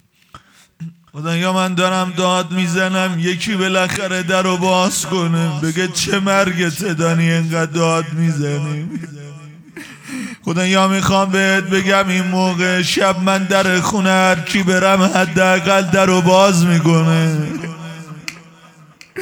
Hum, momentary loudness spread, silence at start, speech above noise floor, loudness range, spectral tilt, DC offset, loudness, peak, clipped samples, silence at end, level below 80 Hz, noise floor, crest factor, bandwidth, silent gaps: none; 16 LU; 0.35 s; 30 dB; 6 LU; -4.5 dB/octave; under 0.1%; -15 LUFS; 0 dBFS; under 0.1%; 0 s; -52 dBFS; -45 dBFS; 16 dB; over 20 kHz; none